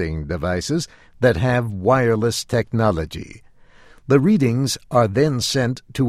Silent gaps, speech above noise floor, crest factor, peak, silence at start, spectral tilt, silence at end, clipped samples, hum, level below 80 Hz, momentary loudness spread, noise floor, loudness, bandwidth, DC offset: none; 28 dB; 18 dB; -2 dBFS; 0 s; -5.5 dB/octave; 0 s; under 0.1%; none; -40 dBFS; 9 LU; -47 dBFS; -19 LUFS; 15 kHz; under 0.1%